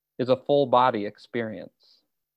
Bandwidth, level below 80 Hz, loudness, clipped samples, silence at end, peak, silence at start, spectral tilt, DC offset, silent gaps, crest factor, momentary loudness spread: 8 kHz; -72 dBFS; -24 LUFS; under 0.1%; 0.7 s; -6 dBFS; 0.2 s; -8 dB/octave; under 0.1%; none; 20 dB; 13 LU